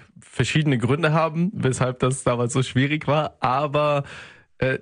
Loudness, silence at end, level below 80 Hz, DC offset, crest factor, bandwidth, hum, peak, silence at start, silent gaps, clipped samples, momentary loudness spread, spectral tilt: -22 LUFS; 0 s; -50 dBFS; under 0.1%; 16 dB; 10.5 kHz; none; -6 dBFS; 0.35 s; none; under 0.1%; 6 LU; -6 dB/octave